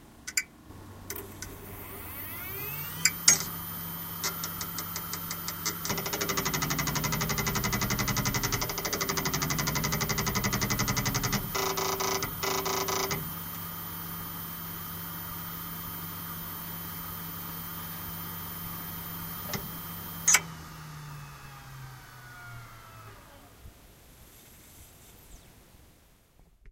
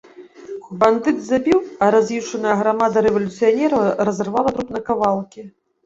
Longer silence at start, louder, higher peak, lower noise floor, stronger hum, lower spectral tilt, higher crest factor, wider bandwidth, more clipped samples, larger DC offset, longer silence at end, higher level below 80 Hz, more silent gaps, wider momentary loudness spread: second, 0 s vs 0.2 s; second, -30 LUFS vs -18 LUFS; about the same, -2 dBFS vs -2 dBFS; first, -60 dBFS vs -37 dBFS; neither; second, -2.5 dB/octave vs -6 dB/octave; first, 30 dB vs 18 dB; first, 17 kHz vs 7.8 kHz; neither; neither; second, 0 s vs 0.35 s; about the same, -50 dBFS vs -54 dBFS; neither; first, 18 LU vs 9 LU